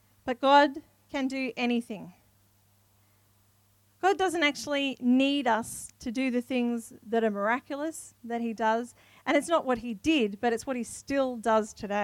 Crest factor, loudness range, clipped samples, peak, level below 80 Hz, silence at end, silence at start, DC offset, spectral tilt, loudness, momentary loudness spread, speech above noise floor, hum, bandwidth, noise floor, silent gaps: 22 dB; 4 LU; under 0.1%; -8 dBFS; -64 dBFS; 0 s; 0.25 s; under 0.1%; -3.5 dB/octave; -28 LUFS; 12 LU; 37 dB; none; 16 kHz; -65 dBFS; none